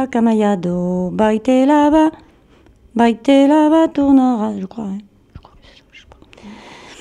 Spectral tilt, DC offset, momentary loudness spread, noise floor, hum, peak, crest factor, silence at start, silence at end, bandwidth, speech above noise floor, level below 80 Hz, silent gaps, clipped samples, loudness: -7 dB/octave; under 0.1%; 14 LU; -49 dBFS; none; -2 dBFS; 14 dB; 0 s; 0.05 s; 10.5 kHz; 35 dB; -48 dBFS; none; under 0.1%; -14 LUFS